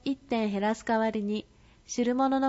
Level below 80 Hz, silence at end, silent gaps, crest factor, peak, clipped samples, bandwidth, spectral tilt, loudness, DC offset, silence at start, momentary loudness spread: -60 dBFS; 0 s; none; 14 dB; -16 dBFS; under 0.1%; 8 kHz; -5 dB/octave; -29 LUFS; under 0.1%; 0.05 s; 8 LU